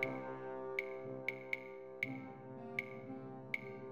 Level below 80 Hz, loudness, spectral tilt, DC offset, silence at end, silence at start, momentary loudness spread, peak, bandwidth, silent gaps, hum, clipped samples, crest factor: -82 dBFS; -44 LUFS; -6 dB/octave; under 0.1%; 0 s; 0 s; 7 LU; -24 dBFS; 14 kHz; none; none; under 0.1%; 22 dB